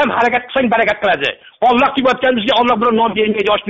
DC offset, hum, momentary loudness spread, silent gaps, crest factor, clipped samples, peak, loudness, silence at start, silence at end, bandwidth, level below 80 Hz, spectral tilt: under 0.1%; none; 3 LU; none; 12 dB; under 0.1%; -2 dBFS; -14 LUFS; 0 s; 0 s; 8 kHz; -48 dBFS; -1.5 dB/octave